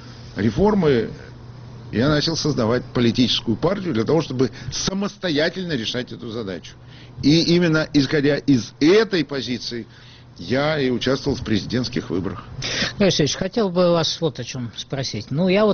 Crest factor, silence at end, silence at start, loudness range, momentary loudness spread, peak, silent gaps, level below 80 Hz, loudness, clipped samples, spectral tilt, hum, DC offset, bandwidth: 16 dB; 0 s; 0 s; 4 LU; 13 LU; -6 dBFS; none; -44 dBFS; -21 LUFS; under 0.1%; -4.5 dB/octave; none; under 0.1%; 6.8 kHz